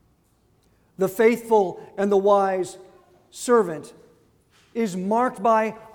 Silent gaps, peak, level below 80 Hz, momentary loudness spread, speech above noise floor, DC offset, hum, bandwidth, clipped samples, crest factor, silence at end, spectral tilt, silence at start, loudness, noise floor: none; -6 dBFS; -66 dBFS; 11 LU; 41 dB; under 0.1%; none; 19.5 kHz; under 0.1%; 18 dB; 0.1 s; -5.5 dB/octave; 1 s; -22 LUFS; -63 dBFS